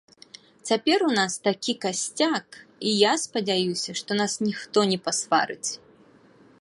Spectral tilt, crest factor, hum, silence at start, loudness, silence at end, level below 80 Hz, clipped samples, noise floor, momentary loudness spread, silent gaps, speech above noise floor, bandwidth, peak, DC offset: -3 dB/octave; 20 dB; none; 0.65 s; -24 LUFS; 0.85 s; -74 dBFS; under 0.1%; -55 dBFS; 9 LU; none; 30 dB; 11.5 kHz; -6 dBFS; under 0.1%